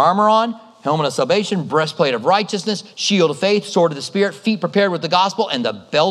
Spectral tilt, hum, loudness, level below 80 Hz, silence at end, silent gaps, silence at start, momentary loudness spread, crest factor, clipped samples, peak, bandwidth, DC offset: -4.5 dB/octave; none; -18 LUFS; -74 dBFS; 0 s; none; 0 s; 6 LU; 16 dB; under 0.1%; -2 dBFS; 12.5 kHz; under 0.1%